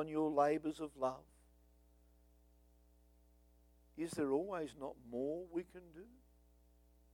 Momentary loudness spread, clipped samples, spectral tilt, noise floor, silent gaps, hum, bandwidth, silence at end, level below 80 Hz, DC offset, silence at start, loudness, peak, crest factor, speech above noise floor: 21 LU; under 0.1%; -6 dB/octave; -69 dBFS; none; 60 Hz at -70 dBFS; 18.5 kHz; 1 s; -70 dBFS; under 0.1%; 0 s; -40 LUFS; -20 dBFS; 22 dB; 28 dB